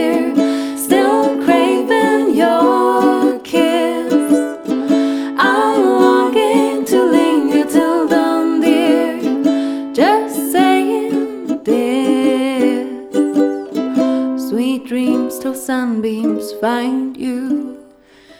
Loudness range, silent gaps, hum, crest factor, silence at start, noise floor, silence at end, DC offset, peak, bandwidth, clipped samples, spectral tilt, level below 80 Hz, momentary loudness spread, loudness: 5 LU; none; none; 14 dB; 0 s; -44 dBFS; 0.55 s; under 0.1%; 0 dBFS; 17.5 kHz; under 0.1%; -4.5 dB/octave; -60 dBFS; 7 LU; -15 LUFS